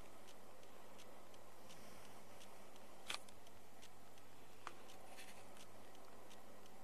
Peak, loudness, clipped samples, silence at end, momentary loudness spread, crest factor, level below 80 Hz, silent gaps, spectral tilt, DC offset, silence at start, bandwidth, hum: -24 dBFS; -58 LUFS; under 0.1%; 0 s; 11 LU; 34 dB; -82 dBFS; none; -2.5 dB/octave; 0.4%; 0 s; 14 kHz; none